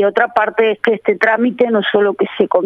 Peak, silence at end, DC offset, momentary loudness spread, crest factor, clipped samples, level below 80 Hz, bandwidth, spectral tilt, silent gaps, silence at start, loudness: 0 dBFS; 0 s; under 0.1%; 2 LU; 14 dB; under 0.1%; -60 dBFS; 6.2 kHz; -6.5 dB/octave; none; 0 s; -14 LUFS